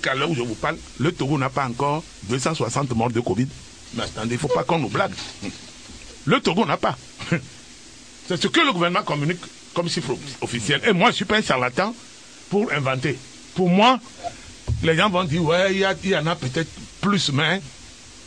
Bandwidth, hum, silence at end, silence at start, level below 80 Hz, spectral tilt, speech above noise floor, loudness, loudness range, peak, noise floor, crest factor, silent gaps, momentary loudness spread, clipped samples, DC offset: 10.5 kHz; none; 0 s; 0 s; -48 dBFS; -5 dB/octave; 22 dB; -22 LUFS; 4 LU; -4 dBFS; -44 dBFS; 18 dB; none; 17 LU; under 0.1%; 0.2%